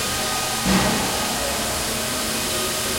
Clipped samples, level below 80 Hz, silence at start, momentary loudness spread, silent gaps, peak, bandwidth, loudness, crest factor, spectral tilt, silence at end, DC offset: under 0.1%; -40 dBFS; 0 s; 4 LU; none; -6 dBFS; 16.5 kHz; -21 LUFS; 18 dB; -2.5 dB/octave; 0 s; under 0.1%